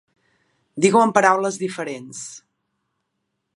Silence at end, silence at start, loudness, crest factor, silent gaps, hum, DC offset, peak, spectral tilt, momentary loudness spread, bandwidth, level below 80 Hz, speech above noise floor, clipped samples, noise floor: 1.15 s; 0.75 s; -19 LUFS; 22 dB; none; none; under 0.1%; 0 dBFS; -4.5 dB/octave; 19 LU; 11.5 kHz; -70 dBFS; 57 dB; under 0.1%; -76 dBFS